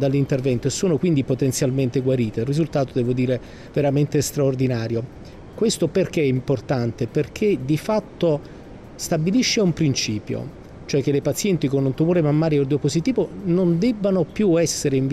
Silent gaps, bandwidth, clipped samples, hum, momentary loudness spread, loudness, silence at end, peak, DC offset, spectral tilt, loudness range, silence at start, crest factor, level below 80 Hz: none; 15.5 kHz; under 0.1%; none; 8 LU; -21 LUFS; 0 s; -10 dBFS; under 0.1%; -6 dB/octave; 2 LU; 0 s; 10 dB; -46 dBFS